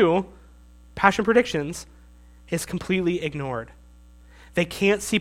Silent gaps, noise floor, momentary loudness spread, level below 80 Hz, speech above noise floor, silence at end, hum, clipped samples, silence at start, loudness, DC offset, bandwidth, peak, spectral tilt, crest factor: none; -49 dBFS; 15 LU; -48 dBFS; 26 dB; 0 s; 60 Hz at -45 dBFS; under 0.1%; 0 s; -24 LUFS; under 0.1%; 16.5 kHz; 0 dBFS; -5 dB/octave; 24 dB